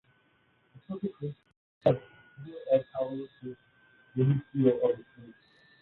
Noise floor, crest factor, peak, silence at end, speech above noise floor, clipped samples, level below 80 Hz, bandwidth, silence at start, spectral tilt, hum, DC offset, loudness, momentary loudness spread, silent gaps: -68 dBFS; 24 dB; -8 dBFS; 0.5 s; 39 dB; under 0.1%; -68 dBFS; 4.3 kHz; 0.9 s; -11 dB/octave; none; under 0.1%; -30 LUFS; 19 LU; 1.57-1.81 s